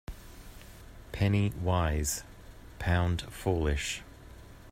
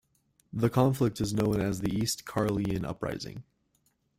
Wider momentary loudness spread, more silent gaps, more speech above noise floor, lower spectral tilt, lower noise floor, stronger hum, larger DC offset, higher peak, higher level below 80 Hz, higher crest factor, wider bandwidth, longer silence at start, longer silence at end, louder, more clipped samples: first, 23 LU vs 13 LU; neither; second, 21 dB vs 44 dB; about the same, -5 dB/octave vs -6 dB/octave; second, -50 dBFS vs -72 dBFS; neither; neither; about the same, -12 dBFS vs -10 dBFS; first, -42 dBFS vs -52 dBFS; about the same, 20 dB vs 20 dB; about the same, 16 kHz vs 16 kHz; second, 0.1 s vs 0.55 s; second, 0 s vs 0.75 s; about the same, -31 LUFS vs -30 LUFS; neither